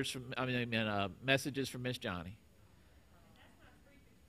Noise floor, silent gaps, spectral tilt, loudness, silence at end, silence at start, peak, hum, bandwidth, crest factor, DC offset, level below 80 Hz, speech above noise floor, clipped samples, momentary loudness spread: -64 dBFS; none; -4.5 dB/octave; -37 LUFS; 0.6 s; 0 s; -14 dBFS; none; 15.5 kHz; 26 dB; under 0.1%; -68 dBFS; 26 dB; under 0.1%; 9 LU